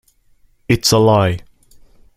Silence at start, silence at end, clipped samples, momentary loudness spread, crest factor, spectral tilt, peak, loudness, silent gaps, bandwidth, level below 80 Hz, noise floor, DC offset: 0.7 s; 0.75 s; under 0.1%; 9 LU; 18 dB; -5 dB/octave; 0 dBFS; -14 LUFS; none; 16 kHz; -42 dBFS; -53 dBFS; under 0.1%